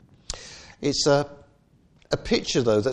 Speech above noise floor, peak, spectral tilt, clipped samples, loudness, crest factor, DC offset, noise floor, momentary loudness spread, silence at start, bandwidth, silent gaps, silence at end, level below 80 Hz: 37 dB; -8 dBFS; -4.5 dB/octave; under 0.1%; -24 LUFS; 18 dB; under 0.1%; -59 dBFS; 16 LU; 0.3 s; 11 kHz; none; 0 s; -46 dBFS